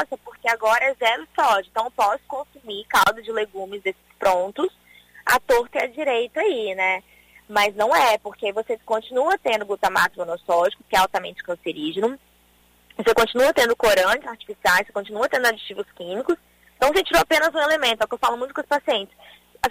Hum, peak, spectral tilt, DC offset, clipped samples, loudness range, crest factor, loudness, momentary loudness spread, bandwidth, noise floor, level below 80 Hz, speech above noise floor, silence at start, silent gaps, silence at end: 60 Hz at -60 dBFS; -6 dBFS; -2 dB/octave; under 0.1%; under 0.1%; 3 LU; 16 dB; -21 LUFS; 11 LU; 16 kHz; -58 dBFS; -52 dBFS; 36 dB; 0 s; none; 0 s